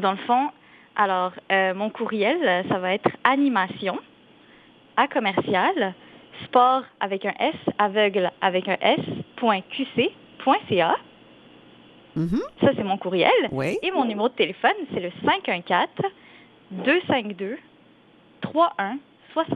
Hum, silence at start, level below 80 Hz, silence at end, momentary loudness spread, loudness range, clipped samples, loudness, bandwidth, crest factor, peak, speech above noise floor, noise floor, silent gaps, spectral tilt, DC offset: none; 0 s; -62 dBFS; 0 s; 10 LU; 3 LU; under 0.1%; -23 LUFS; 10 kHz; 24 dB; 0 dBFS; 32 dB; -54 dBFS; none; -7 dB/octave; under 0.1%